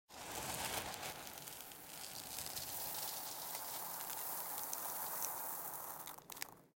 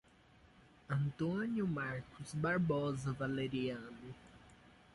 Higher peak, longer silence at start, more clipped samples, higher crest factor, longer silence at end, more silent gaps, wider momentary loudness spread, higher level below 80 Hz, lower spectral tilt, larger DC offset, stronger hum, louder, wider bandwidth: first, -18 dBFS vs -24 dBFS; second, 0.1 s vs 0.9 s; neither; first, 28 dB vs 16 dB; second, 0.1 s vs 0.25 s; neither; second, 8 LU vs 14 LU; second, -72 dBFS vs -66 dBFS; second, -1 dB/octave vs -7 dB/octave; neither; neither; second, -43 LUFS vs -39 LUFS; first, 17 kHz vs 11.5 kHz